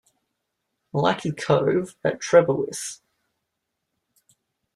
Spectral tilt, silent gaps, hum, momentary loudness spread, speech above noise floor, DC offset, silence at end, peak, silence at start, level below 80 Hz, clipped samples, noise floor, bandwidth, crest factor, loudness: -5 dB/octave; none; none; 13 LU; 58 dB; under 0.1%; 1.8 s; -4 dBFS; 0.95 s; -64 dBFS; under 0.1%; -80 dBFS; 13 kHz; 22 dB; -22 LUFS